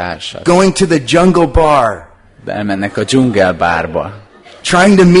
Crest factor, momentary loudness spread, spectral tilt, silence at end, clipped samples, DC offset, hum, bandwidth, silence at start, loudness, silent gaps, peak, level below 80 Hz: 12 dB; 13 LU; -5.5 dB/octave; 0 s; 0.1%; under 0.1%; none; 11 kHz; 0 s; -11 LUFS; none; 0 dBFS; -30 dBFS